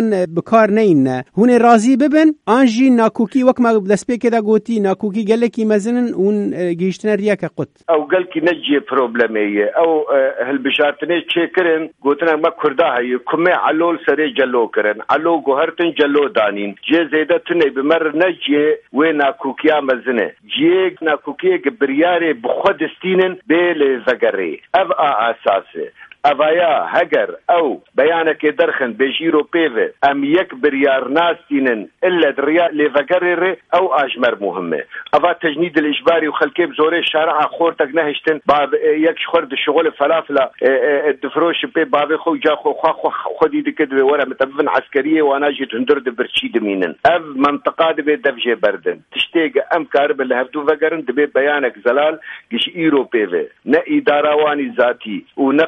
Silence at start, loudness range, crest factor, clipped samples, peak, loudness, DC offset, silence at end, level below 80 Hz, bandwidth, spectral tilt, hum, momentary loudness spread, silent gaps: 0 s; 2 LU; 16 dB; under 0.1%; 0 dBFS; -15 LUFS; under 0.1%; 0 s; -60 dBFS; 10.5 kHz; -5.5 dB/octave; none; 5 LU; none